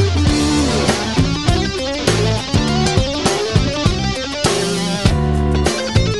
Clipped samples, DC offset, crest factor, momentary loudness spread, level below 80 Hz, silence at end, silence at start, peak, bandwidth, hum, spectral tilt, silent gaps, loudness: under 0.1%; 0.7%; 16 dB; 3 LU; -24 dBFS; 0 s; 0 s; 0 dBFS; 12.5 kHz; none; -5 dB/octave; none; -16 LUFS